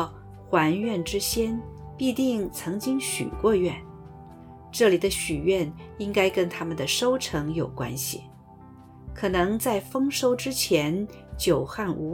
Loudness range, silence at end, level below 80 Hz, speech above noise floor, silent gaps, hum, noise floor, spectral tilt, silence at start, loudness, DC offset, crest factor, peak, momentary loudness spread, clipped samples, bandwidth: 3 LU; 0 s; -46 dBFS; 22 dB; none; none; -48 dBFS; -4.5 dB/octave; 0 s; -26 LUFS; under 0.1%; 20 dB; -8 dBFS; 14 LU; under 0.1%; 19 kHz